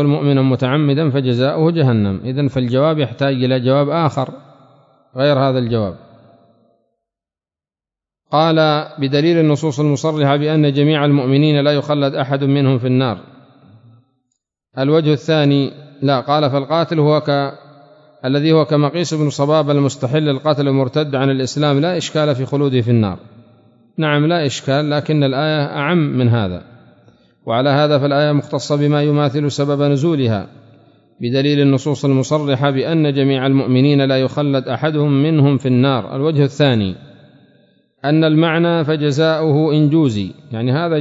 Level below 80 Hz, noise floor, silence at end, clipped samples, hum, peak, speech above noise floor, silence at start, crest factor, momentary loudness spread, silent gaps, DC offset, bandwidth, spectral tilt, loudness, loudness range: -58 dBFS; under -90 dBFS; 0 s; under 0.1%; none; -2 dBFS; over 75 dB; 0 s; 14 dB; 6 LU; none; under 0.1%; 7.8 kHz; -7 dB/octave; -16 LUFS; 4 LU